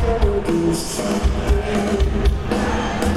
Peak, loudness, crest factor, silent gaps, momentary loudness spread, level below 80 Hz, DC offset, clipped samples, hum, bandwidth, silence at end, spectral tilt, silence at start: -6 dBFS; -20 LUFS; 14 dB; none; 2 LU; -22 dBFS; under 0.1%; under 0.1%; none; 14 kHz; 0 s; -6 dB/octave; 0 s